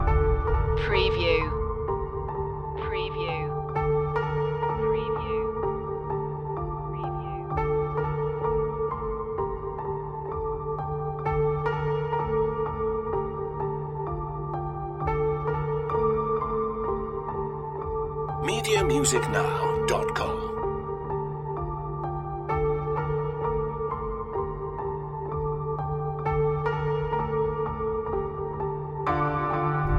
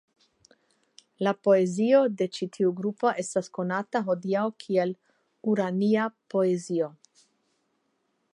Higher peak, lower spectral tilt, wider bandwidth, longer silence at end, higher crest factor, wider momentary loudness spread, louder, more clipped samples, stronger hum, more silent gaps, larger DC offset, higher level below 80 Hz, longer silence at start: about the same, -10 dBFS vs -10 dBFS; about the same, -5.5 dB/octave vs -6 dB/octave; first, 13.5 kHz vs 11.5 kHz; second, 0 s vs 1.45 s; about the same, 18 dB vs 18 dB; about the same, 8 LU vs 8 LU; about the same, -28 LUFS vs -27 LUFS; neither; neither; neither; neither; first, -38 dBFS vs -80 dBFS; second, 0 s vs 1.2 s